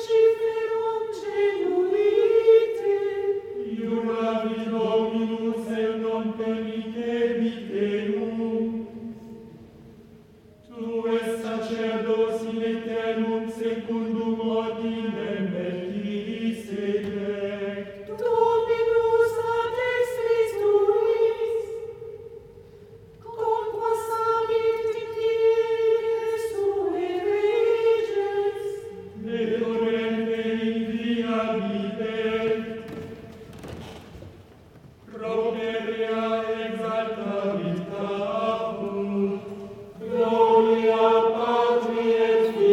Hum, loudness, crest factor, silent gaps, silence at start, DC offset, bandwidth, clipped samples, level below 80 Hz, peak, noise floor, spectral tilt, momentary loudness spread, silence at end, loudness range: none; -25 LUFS; 18 dB; none; 0 s; under 0.1%; 12.5 kHz; under 0.1%; -60 dBFS; -6 dBFS; -51 dBFS; -6.5 dB/octave; 15 LU; 0 s; 8 LU